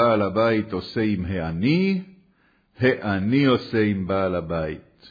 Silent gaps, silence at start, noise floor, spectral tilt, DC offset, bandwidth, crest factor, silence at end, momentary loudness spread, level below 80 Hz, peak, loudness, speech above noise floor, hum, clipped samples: none; 0 s; -62 dBFS; -9 dB/octave; under 0.1%; 5 kHz; 16 dB; 0 s; 8 LU; -50 dBFS; -6 dBFS; -23 LUFS; 40 dB; none; under 0.1%